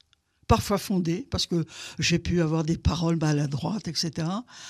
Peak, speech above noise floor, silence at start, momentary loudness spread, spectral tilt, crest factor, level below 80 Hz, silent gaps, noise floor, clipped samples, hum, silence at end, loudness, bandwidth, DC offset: -6 dBFS; 23 dB; 0.5 s; 6 LU; -5.5 dB/octave; 20 dB; -40 dBFS; none; -49 dBFS; under 0.1%; none; 0 s; -26 LUFS; 14.5 kHz; under 0.1%